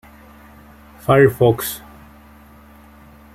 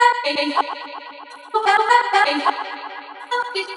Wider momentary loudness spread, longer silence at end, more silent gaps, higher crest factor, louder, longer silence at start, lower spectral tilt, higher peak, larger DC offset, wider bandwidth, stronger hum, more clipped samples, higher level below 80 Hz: second, 15 LU vs 19 LU; first, 1.55 s vs 0 s; neither; about the same, 18 dB vs 18 dB; first, -16 LUFS vs -19 LUFS; first, 1.1 s vs 0 s; first, -6 dB/octave vs -0.5 dB/octave; about the same, -2 dBFS vs -2 dBFS; neither; first, 16 kHz vs 11.5 kHz; neither; neither; first, -46 dBFS vs under -90 dBFS